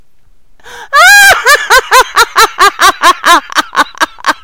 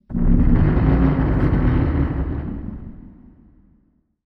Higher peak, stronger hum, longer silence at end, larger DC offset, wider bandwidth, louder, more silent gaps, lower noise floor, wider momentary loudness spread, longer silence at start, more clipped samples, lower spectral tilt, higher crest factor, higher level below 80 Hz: first, 0 dBFS vs -4 dBFS; neither; second, 0.1 s vs 1.15 s; first, 2% vs under 0.1%; first, over 20 kHz vs 4.6 kHz; first, -5 LUFS vs -19 LUFS; neither; second, -46 dBFS vs -61 dBFS; second, 10 LU vs 15 LU; first, 0.75 s vs 0.1 s; first, 6% vs under 0.1%; second, 0.5 dB/octave vs -11.5 dB/octave; second, 8 dB vs 16 dB; second, -38 dBFS vs -22 dBFS